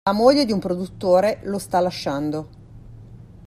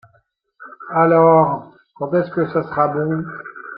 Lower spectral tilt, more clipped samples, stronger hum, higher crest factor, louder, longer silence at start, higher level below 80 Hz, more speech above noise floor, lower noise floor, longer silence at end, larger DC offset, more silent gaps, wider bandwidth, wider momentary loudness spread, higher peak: second, -6 dB/octave vs -12.5 dB/octave; neither; neither; about the same, 18 dB vs 16 dB; second, -21 LUFS vs -17 LUFS; second, 0.05 s vs 0.6 s; first, -48 dBFS vs -60 dBFS; second, 22 dB vs 44 dB; second, -42 dBFS vs -61 dBFS; first, 0.2 s vs 0 s; neither; neither; first, 14.5 kHz vs 5 kHz; second, 11 LU vs 18 LU; about the same, -2 dBFS vs -2 dBFS